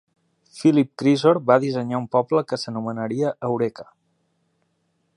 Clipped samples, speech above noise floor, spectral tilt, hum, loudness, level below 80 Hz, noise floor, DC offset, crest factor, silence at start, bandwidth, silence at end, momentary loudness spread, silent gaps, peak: under 0.1%; 49 dB; -7 dB/octave; none; -21 LUFS; -70 dBFS; -70 dBFS; under 0.1%; 20 dB; 0.55 s; 11 kHz; 1.35 s; 9 LU; none; -2 dBFS